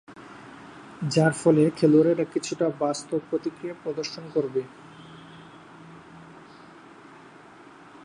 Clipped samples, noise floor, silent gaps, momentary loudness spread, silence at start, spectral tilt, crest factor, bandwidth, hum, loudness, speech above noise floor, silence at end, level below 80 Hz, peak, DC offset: under 0.1%; -49 dBFS; none; 26 LU; 0.1 s; -6 dB/octave; 20 dB; 11.5 kHz; none; -24 LUFS; 25 dB; 1.8 s; -68 dBFS; -6 dBFS; under 0.1%